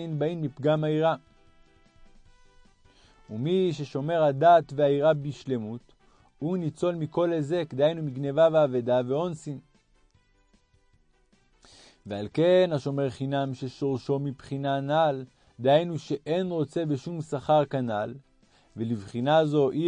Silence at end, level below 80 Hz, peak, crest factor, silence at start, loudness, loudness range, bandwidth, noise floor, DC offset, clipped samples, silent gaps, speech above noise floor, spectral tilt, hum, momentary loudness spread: 0 s; -64 dBFS; -10 dBFS; 18 dB; 0 s; -26 LUFS; 6 LU; 10 kHz; -64 dBFS; under 0.1%; under 0.1%; none; 39 dB; -7.5 dB/octave; none; 14 LU